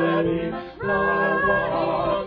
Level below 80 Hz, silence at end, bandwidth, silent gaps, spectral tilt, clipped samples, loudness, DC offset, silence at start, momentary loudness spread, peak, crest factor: -46 dBFS; 0 s; 5.2 kHz; none; -9 dB/octave; under 0.1%; -22 LUFS; under 0.1%; 0 s; 7 LU; -8 dBFS; 14 dB